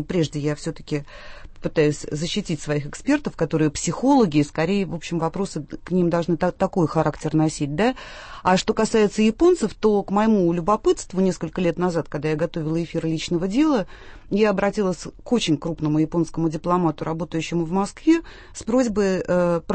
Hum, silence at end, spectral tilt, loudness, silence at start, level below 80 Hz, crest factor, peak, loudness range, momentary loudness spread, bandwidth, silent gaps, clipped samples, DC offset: none; 0 s; -6 dB/octave; -22 LUFS; 0 s; -44 dBFS; 16 dB; -6 dBFS; 3 LU; 8 LU; 8.8 kHz; none; under 0.1%; under 0.1%